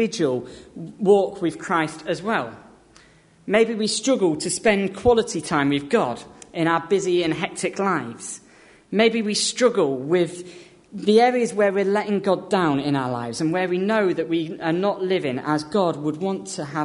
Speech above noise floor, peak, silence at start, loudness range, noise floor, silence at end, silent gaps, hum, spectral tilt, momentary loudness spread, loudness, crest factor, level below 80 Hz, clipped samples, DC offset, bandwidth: 32 dB; -4 dBFS; 0 s; 3 LU; -53 dBFS; 0 s; none; none; -4.5 dB/octave; 10 LU; -22 LUFS; 18 dB; -56 dBFS; under 0.1%; under 0.1%; 11 kHz